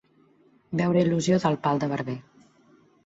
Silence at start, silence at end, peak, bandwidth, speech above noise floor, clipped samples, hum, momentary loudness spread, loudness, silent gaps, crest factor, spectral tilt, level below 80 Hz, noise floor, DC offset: 0.7 s; 0.85 s; -10 dBFS; 8 kHz; 37 dB; under 0.1%; none; 11 LU; -25 LUFS; none; 18 dB; -6.5 dB/octave; -62 dBFS; -60 dBFS; under 0.1%